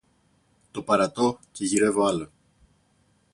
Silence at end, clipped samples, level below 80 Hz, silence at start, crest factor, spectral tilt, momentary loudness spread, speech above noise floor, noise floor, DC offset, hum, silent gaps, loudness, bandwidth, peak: 1.1 s; under 0.1%; -62 dBFS; 0.75 s; 18 dB; -4.5 dB/octave; 16 LU; 41 dB; -65 dBFS; under 0.1%; none; none; -24 LUFS; 11.5 kHz; -8 dBFS